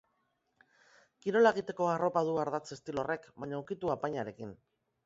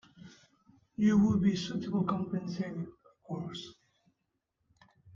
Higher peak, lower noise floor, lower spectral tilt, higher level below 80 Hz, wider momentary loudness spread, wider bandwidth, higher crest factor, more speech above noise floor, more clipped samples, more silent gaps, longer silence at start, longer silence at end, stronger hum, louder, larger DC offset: first, -12 dBFS vs -16 dBFS; second, -78 dBFS vs -82 dBFS; second, -4.5 dB/octave vs -7 dB/octave; second, -72 dBFS vs -64 dBFS; second, 14 LU vs 19 LU; about the same, 7.6 kHz vs 7.4 kHz; about the same, 22 dB vs 18 dB; second, 46 dB vs 52 dB; neither; neither; first, 1.25 s vs 0.25 s; first, 0.5 s vs 0.05 s; neither; about the same, -33 LUFS vs -32 LUFS; neither